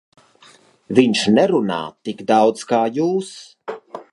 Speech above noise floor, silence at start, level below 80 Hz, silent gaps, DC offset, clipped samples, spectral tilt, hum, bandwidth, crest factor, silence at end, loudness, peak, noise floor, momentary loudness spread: 33 dB; 0.9 s; -64 dBFS; none; under 0.1%; under 0.1%; -5 dB/octave; none; 11.5 kHz; 18 dB; 0.1 s; -18 LUFS; 0 dBFS; -50 dBFS; 18 LU